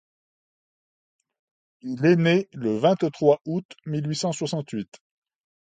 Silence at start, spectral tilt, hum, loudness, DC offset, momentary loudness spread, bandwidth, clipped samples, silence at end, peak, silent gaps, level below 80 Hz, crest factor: 1.85 s; -6 dB/octave; none; -24 LUFS; under 0.1%; 14 LU; 9.4 kHz; under 0.1%; 0.95 s; -4 dBFS; 3.65-3.69 s; -68 dBFS; 20 dB